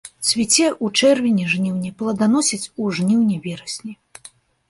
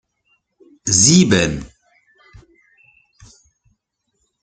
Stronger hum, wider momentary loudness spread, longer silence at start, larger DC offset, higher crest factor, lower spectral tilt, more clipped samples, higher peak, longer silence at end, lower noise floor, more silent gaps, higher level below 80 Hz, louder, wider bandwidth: neither; second, 13 LU vs 17 LU; second, 0.05 s vs 0.85 s; neither; about the same, 18 dB vs 20 dB; about the same, -3.5 dB/octave vs -3.5 dB/octave; neither; about the same, -2 dBFS vs 0 dBFS; second, 0.75 s vs 2.75 s; second, -47 dBFS vs -71 dBFS; neither; second, -60 dBFS vs -46 dBFS; second, -18 LUFS vs -13 LUFS; first, 11.5 kHz vs 10 kHz